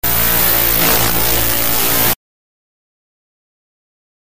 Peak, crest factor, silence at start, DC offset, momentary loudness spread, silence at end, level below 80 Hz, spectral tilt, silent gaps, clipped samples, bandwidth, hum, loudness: -2 dBFS; 14 dB; 0 s; 9%; 3 LU; 2.15 s; -32 dBFS; -2 dB/octave; none; under 0.1%; 16 kHz; none; -11 LUFS